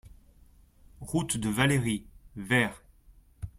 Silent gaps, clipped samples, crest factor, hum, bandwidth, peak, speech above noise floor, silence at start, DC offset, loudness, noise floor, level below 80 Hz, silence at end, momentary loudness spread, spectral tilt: none; under 0.1%; 22 dB; none; 16 kHz; -8 dBFS; 30 dB; 0.05 s; under 0.1%; -28 LUFS; -58 dBFS; -52 dBFS; 0.1 s; 20 LU; -4.5 dB/octave